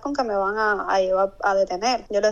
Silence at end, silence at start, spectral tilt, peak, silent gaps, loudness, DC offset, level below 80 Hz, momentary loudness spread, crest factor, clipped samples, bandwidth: 0 s; 0 s; -3.5 dB/octave; -8 dBFS; none; -22 LUFS; under 0.1%; -50 dBFS; 2 LU; 12 dB; under 0.1%; 7.6 kHz